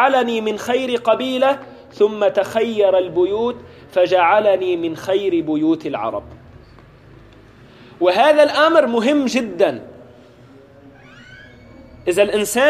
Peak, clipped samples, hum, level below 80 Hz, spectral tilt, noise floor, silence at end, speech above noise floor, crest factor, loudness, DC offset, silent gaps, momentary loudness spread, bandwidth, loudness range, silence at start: -2 dBFS; under 0.1%; none; -54 dBFS; -4 dB/octave; -44 dBFS; 0 s; 28 dB; 16 dB; -17 LUFS; under 0.1%; none; 10 LU; 14.5 kHz; 6 LU; 0 s